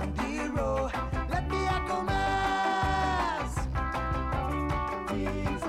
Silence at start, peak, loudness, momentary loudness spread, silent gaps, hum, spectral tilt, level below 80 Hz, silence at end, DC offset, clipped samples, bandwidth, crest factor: 0 s; -16 dBFS; -30 LUFS; 5 LU; none; none; -6 dB/octave; -36 dBFS; 0 s; under 0.1%; under 0.1%; 14.5 kHz; 14 dB